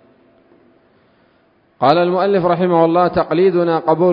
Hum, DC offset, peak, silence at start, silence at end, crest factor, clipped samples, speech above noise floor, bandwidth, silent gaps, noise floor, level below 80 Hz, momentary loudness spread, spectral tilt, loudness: none; under 0.1%; 0 dBFS; 1.8 s; 0 s; 16 dB; under 0.1%; 42 dB; 5.4 kHz; none; -56 dBFS; -52 dBFS; 2 LU; -9.5 dB/octave; -14 LUFS